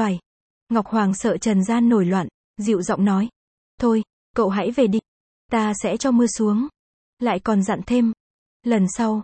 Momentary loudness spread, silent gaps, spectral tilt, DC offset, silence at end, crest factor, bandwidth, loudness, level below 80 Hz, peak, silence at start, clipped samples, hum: 8 LU; 0.26-0.67 s, 2.34-2.54 s, 3.36-3.78 s, 4.13-4.34 s, 5.08-5.49 s, 6.79-7.17 s, 8.20-8.60 s; -6 dB/octave; under 0.1%; 0 s; 14 dB; 8.8 kHz; -21 LUFS; -54 dBFS; -6 dBFS; 0 s; under 0.1%; none